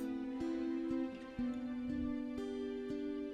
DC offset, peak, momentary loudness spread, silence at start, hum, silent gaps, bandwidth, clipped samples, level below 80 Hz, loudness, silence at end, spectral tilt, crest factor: under 0.1%; -30 dBFS; 3 LU; 0 s; none; none; 9 kHz; under 0.1%; -60 dBFS; -41 LUFS; 0 s; -7 dB/octave; 10 dB